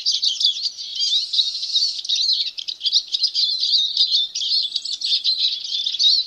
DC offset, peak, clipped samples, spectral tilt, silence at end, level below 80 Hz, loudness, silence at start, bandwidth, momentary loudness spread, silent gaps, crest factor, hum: under 0.1%; -4 dBFS; under 0.1%; 5 dB/octave; 0 s; -74 dBFS; -18 LUFS; 0 s; 13.5 kHz; 6 LU; none; 16 dB; none